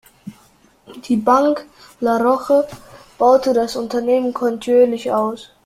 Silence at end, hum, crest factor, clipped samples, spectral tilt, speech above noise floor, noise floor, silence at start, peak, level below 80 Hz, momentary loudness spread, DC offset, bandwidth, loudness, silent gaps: 0.2 s; none; 16 dB; under 0.1%; -5.5 dB/octave; 36 dB; -53 dBFS; 0.25 s; -2 dBFS; -56 dBFS; 9 LU; under 0.1%; 14.5 kHz; -17 LUFS; none